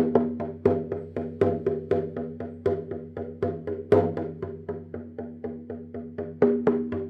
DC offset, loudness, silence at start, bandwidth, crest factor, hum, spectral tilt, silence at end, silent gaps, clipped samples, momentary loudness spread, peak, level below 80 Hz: under 0.1%; -28 LUFS; 0 s; 5.2 kHz; 22 dB; none; -10 dB/octave; 0 s; none; under 0.1%; 15 LU; -6 dBFS; -60 dBFS